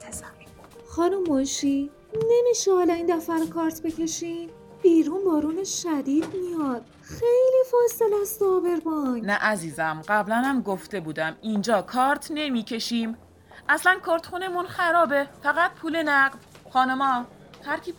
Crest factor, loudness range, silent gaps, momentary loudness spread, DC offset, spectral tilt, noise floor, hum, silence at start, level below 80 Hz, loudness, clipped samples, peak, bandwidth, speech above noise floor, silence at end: 16 dB; 2 LU; none; 11 LU; under 0.1%; -4 dB/octave; -48 dBFS; none; 0 s; -58 dBFS; -24 LUFS; under 0.1%; -8 dBFS; 19 kHz; 24 dB; 0.05 s